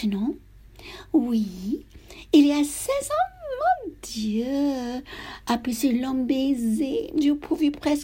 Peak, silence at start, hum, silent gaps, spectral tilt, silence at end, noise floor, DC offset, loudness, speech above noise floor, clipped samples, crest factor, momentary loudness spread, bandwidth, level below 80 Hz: -6 dBFS; 0 s; none; none; -4.5 dB/octave; 0 s; -44 dBFS; under 0.1%; -25 LUFS; 21 dB; under 0.1%; 18 dB; 13 LU; 16.5 kHz; -50 dBFS